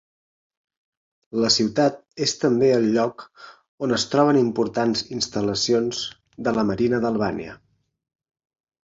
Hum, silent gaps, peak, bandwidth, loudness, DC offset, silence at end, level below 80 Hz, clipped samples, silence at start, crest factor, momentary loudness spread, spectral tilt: none; 3.68-3.78 s; -4 dBFS; 7.8 kHz; -22 LUFS; under 0.1%; 1.3 s; -56 dBFS; under 0.1%; 1.35 s; 18 dB; 11 LU; -4.5 dB/octave